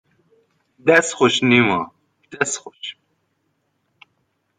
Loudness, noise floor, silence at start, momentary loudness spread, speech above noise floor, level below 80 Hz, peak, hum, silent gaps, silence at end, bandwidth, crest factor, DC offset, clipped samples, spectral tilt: -17 LUFS; -70 dBFS; 0.85 s; 19 LU; 52 dB; -64 dBFS; 0 dBFS; none; none; 1.65 s; 9.6 kHz; 20 dB; under 0.1%; under 0.1%; -3.5 dB/octave